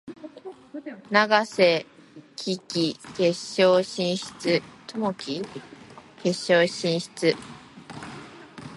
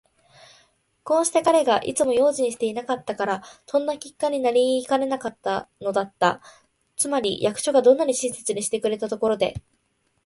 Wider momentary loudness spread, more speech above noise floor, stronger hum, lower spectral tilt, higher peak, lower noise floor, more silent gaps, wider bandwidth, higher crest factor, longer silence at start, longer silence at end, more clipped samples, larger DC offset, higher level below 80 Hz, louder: first, 22 LU vs 9 LU; second, 20 dB vs 47 dB; neither; about the same, -4.5 dB/octave vs -3.5 dB/octave; about the same, -4 dBFS vs -4 dBFS; second, -44 dBFS vs -70 dBFS; neither; about the same, 11.5 kHz vs 11.5 kHz; about the same, 22 dB vs 18 dB; second, 0.05 s vs 1.05 s; second, 0 s vs 0.65 s; neither; neither; second, -68 dBFS vs -60 dBFS; about the same, -24 LUFS vs -23 LUFS